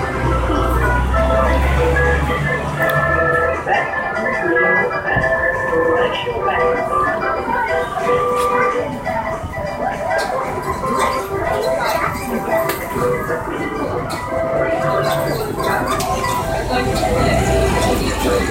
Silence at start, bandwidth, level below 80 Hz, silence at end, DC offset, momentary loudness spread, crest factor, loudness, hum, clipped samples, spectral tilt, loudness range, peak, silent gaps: 0 s; 16 kHz; -26 dBFS; 0 s; under 0.1%; 6 LU; 14 dB; -17 LUFS; none; under 0.1%; -5.5 dB/octave; 4 LU; -4 dBFS; none